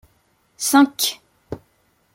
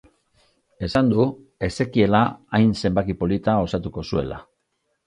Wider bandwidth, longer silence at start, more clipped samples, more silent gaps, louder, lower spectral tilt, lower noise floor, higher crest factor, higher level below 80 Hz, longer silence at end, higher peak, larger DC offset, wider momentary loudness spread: first, 16.5 kHz vs 10.5 kHz; second, 0.6 s vs 0.8 s; neither; neither; first, -18 LUFS vs -22 LUFS; second, -2 dB/octave vs -7.5 dB/octave; second, -63 dBFS vs -73 dBFS; about the same, 20 dB vs 18 dB; second, -58 dBFS vs -42 dBFS; about the same, 0.55 s vs 0.65 s; about the same, -2 dBFS vs -4 dBFS; neither; first, 22 LU vs 10 LU